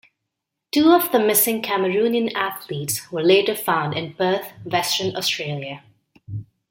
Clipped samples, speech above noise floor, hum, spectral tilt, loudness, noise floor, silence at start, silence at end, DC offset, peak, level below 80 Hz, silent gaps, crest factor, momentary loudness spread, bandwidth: under 0.1%; 61 dB; none; -3.5 dB/octave; -20 LUFS; -81 dBFS; 0.75 s; 0.3 s; under 0.1%; -2 dBFS; -64 dBFS; none; 18 dB; 16 LU; 17 kHz